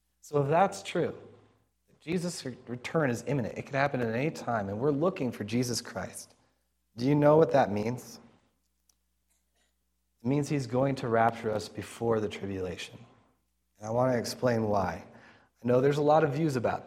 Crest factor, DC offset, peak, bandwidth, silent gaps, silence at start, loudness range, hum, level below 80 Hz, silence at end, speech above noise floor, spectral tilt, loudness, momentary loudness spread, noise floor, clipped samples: 20 dB; under 0.1%; -10 dBFS; 15.5 kHz; none; 0.25 s; 5 LU; none; -66 dBFS; 0 s; 49 dB; -6 dB/octave; -29 LUFS; 15 LU; -77 dBFS; under 0.1%